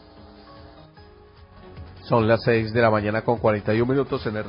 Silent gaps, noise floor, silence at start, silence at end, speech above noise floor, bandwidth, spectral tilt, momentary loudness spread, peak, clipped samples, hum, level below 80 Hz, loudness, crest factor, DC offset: none; -48 dBFS; 0.2 s; 0 s; 27 dB; 5.4 kHz; -11.5 dB/octave; 14 LU; -6 dBFS; under 0.1%; none; -48 dBFS; -21 LUFS; 18 dB; under 0.1%